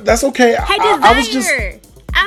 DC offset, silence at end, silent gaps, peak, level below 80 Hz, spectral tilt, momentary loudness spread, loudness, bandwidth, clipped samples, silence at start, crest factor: under 0.1%; 0 s; none; 0 dBFS; -28 dBFS; -3 dB/octave; 8 LU; -12 LUFS; 15.5 kHz; under 0.1%; 0 s; 14 dB